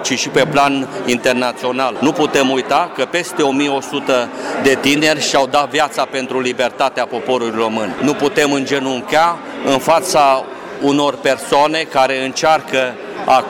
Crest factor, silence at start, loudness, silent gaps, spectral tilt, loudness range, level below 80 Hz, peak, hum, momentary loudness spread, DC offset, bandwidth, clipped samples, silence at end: 12 dB; 0 s; -15 LUFS; none; -3.5 dB/octave; 2 LU; -54 dBFS; -4 dBFS; none; 6 LU; under 0.1%; 17.5 kHz; under 0.1%; 0 s